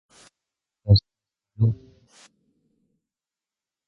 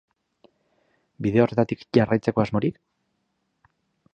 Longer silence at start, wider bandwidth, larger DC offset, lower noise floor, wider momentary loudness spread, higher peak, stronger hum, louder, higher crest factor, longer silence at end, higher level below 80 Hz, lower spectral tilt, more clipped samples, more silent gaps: second, 0.85 s vs 1.2 s; about the same, 7.4 kHz vs 7.2 kHz; neither; first, under -90 dBFS vs -74 dBFS; first, 17 LU vs 7 LU; about the same, -4 dBFS vs -4 dBFS; neither; about the same, -22 LUFS vs -23 LUFS; about the same, 24 dB vs 22 dB; first, 2.15 s vs 1.4 s; first, -42 dBFS vs -56 dBFS; about the same, -8 dB/octave vs -8.5 dB/octave; neither; neither